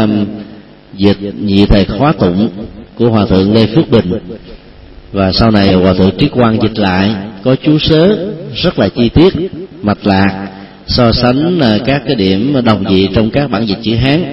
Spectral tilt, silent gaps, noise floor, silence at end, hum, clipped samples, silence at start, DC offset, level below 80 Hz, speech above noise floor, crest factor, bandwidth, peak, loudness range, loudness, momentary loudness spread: -9 dB/octave; none; -34 dBFS; 0 s; none; 0.2%; 0 s; under 0.1%; -28 dBFS; 24 dB; 10 dB; 5.8 kHz; 0 dBFS; 2 LU; -11 LUFS; 11 LU